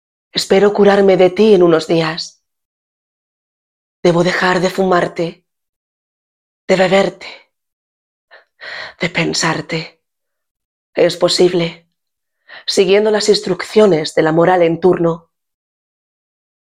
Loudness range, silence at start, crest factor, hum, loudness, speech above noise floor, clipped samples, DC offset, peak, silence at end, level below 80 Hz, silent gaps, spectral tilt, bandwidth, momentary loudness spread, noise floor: 7 LU; 0.35 s; 16 dB; none; -13 LUFS; 66 dB; under 0.1%; under 0.1%; 0 dBFS; 1.45 s; -56 dBFS; 2.65-4.03 s, 5.69-6.68 s, 7.73-8.28 s, 10.51-10.55 s, 10.65-10.93 s; -5 dB/octave; 14.5 kHz; 15 LU; -79 dBFS